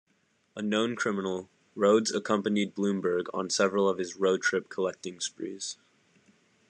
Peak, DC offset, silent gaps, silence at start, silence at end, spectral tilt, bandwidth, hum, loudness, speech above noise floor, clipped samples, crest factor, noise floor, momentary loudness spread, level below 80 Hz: -12 dBFS; under 0.1%; none; 0.55 s; 0.95 s; -4 dB/octave; 10.5 kHz; none; -29 LUFS; 42 dB; under 0.1%; 18 dB; -71 dBFS; 12 LU; -82 dBFS